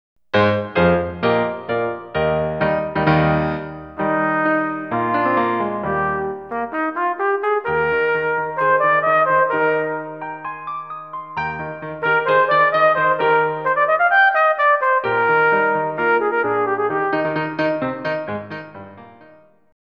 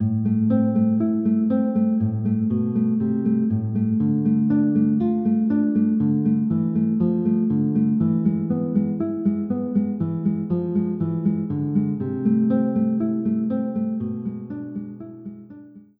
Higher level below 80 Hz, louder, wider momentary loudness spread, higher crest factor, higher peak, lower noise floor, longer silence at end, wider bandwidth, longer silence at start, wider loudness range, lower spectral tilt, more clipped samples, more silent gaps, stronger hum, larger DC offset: first, -48 dBFS vs -60 dBFS; first, -18 LUFS vs -22 LUFS; first, 13 LU vs 6 LU; about the same, 16 dB vs 12 dB; first, -4 dBFS vs -8 dBFS; first, -49 dBFS vs -43 dBFS; first, 0.7 s vs 0.2 s; first, 6.2 kHz vs 2.6 kHz; first, 0.35 s vs 0 s; about the same, 5 LU vs 3 LU; second, -8 dB/octave vs -14 dB/octave; neither; neither; neither; first, 0.1% vs under 0.1%